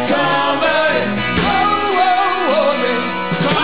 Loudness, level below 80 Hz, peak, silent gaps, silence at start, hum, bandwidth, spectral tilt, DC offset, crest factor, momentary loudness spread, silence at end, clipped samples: -15 LUFS; -40 dBFS; -4 dBFS; none; 0 s; none; 4 kHz; -9 dB/octave; 2%; 12 dB; 3 LU; 0 s; under 0.1%